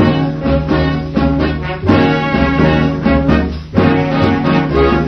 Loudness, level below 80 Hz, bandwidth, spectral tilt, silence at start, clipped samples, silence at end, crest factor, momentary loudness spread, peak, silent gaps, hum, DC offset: -13 LUFS; -24 dBFS; 6.4 kHz; -8.5 dB/octave; 0 s; under 0.1%; 0 s; 12 dB; 4 LU; 0 dBFS; none; none; under 0.1%